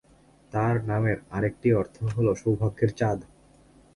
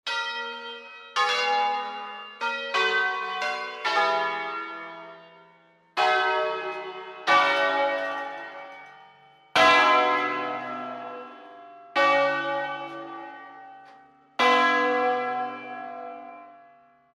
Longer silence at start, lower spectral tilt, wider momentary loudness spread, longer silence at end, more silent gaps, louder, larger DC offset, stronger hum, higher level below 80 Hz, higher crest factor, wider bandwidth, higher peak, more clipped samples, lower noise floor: first, 0.55 s vs 0.05 s; first, -8.5 dB/octave vs -2 dB/octave; second, 5 LU vs 20 LU; about the same, 0.7 s vs 0.6 s; neither; about the same, -26 LUFS vs -24 LUFS; neither; neither; first, -50 dBFS vs -74 dBFS; about the same, 16 dB vs 20 dB; second, 11 kHz vs 13.5 kHz; about the same, -10 dBFS vs -8 dBFS; neither; about the same, -57 dBFS vs -58 dBFS